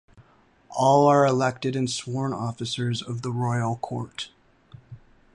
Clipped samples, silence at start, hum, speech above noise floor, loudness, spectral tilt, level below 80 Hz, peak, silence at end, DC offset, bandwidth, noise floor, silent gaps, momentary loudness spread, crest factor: under 0.1%; 0.2 s; none; 34 dB; -24 LUFS; -5.5 dB/octave; -62 dBFS; -6 dBFS; 0.4 s; under 0.1%; 11 kHz; -58 dBFS; none; 15 LU; 18 dB